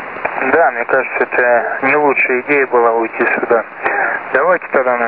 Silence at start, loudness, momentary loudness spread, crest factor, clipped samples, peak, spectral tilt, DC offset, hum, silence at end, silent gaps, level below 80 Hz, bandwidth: 0 s; -14 LUFS; 4 LU; 14 dB; under 0.1%; 0 dBFS; -9 dB/octave; 0.2%; none; 0 s; none; -60 dBFS; 4.9 kHz